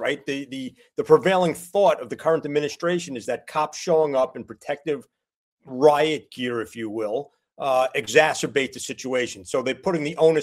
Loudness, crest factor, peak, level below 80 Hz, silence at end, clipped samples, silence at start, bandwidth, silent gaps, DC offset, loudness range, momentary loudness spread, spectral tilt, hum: -23 LUFS; 22 dB; -2 dBFS; -66 dBFS; 0 s; under 0.1%; 0 s; 15.5 kHz; 5.36-5.57 s; under 0.1%; 3 LU; 12 LU; -4.5 dB/octave; none